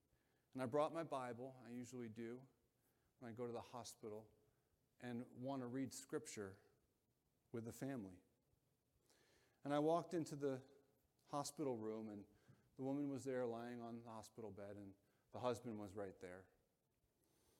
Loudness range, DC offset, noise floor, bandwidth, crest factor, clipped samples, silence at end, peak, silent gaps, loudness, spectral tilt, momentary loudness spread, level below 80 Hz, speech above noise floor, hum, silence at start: 8 LU; under 0.1%; -86 dBFS; 16 kHz; 22 dB; under 0.1%; 1.15 s; -28 dBFS; none; -49 LUFS; -6 dB/octave; 16 LU; -88 dBFS; 37 dB; none; 0.55 s